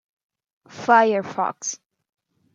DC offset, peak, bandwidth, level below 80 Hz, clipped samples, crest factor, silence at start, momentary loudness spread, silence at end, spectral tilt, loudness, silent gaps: under 0.1%; -2 dBFS; 9.4 kHz; -78 dBFS; under 0.1%; 20 dB; 0.75 s; 14 LU; 0.8 s; -3.5 dB/octave; -21 LUFS; none